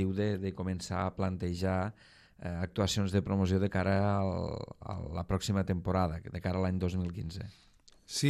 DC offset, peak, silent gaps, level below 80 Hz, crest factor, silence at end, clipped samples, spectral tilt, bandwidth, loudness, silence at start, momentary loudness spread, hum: under 0.1%; -14 dBFS; none; -56 dBFS; 18 dB; 0 s; under 0.1%; -6 dB/octave; 13.5 kHz; -33 LUFS; 0 s; 11 LU; none